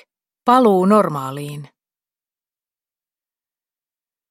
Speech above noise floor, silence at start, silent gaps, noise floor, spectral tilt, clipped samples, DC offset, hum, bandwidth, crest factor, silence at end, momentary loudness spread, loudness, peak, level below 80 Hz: over 75 dB; 0.45 s; none; under -90 dBFS; -7 dB/octave; under 0.1%; under 0.1%; none; 16 kHz; 20 dB; 2.65 s; 18 LU; -15 LUFS; 0 dBFS; -70 dBFS